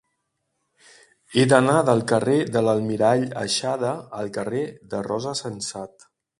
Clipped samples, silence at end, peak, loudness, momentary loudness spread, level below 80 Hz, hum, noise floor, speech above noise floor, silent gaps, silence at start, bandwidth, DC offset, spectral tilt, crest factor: under 0.1%; 0.5 s; 0 dBFS; -22 LUFS; 13 LU; -62 dBFS; none; -76 dBFS; 54 dB; none; 1.3 s; 11.5 kHz; under 0.1%; -5 dB/octave; 22 dB